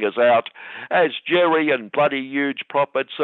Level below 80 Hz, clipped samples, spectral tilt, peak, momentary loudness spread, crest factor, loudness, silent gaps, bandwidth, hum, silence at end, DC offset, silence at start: -76 dBFS; under 0.1%; -8 dB/octave; -6 dBFS; 6 LU; 14 dB; -20 LUFS; none; 4.3 kHz; none; 0 s; under 0.1%; 0 s